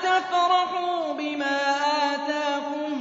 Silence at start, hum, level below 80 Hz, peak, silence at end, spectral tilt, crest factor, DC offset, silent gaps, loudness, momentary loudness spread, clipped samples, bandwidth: 0 s; none; -80 dBFS; -10 dBFS; 0 s; -2 dB/octave; 14 dB; under 0.1%; none; -24 LUFS; 6 LU; under 0.1%; 7.8 kHz